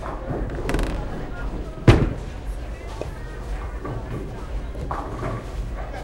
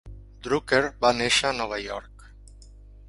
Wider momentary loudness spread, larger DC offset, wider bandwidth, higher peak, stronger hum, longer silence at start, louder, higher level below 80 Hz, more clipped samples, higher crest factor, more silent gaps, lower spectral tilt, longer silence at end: about the same, 14 LU vs 15 LU; neither; about the same, 12.5 kHz vs 11.5 kHz; first, 0 dBFS vs -6 dBFS; second, none vs 50 Hz at -45 dBFS; about the same, 0 s vs 0.05 s; second, -27 LUFS vs -24 LUFS; first, -30 dBFS vs -46 dBFS; neither; about the same, 26 dB vs 22 dB; neither; first, -7 dB/octave vs -3 dB/octave; about the same, 0 s vs 0.1 s